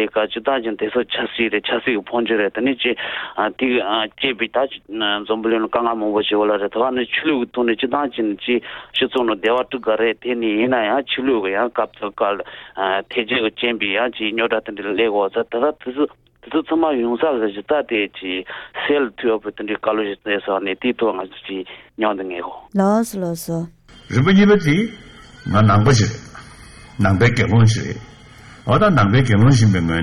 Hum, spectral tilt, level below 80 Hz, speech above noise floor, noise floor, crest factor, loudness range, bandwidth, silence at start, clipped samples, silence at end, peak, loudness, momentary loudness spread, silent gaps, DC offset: none; -6 dB/octave; -46 dBFS; 24 dB; -42 dBFS; 16 dB; 4 LU; 14 kHz; 0 s; under 0.1%; 0 s; -2 dBFS; -19 LUFS; 11 LU; none; under 0.1%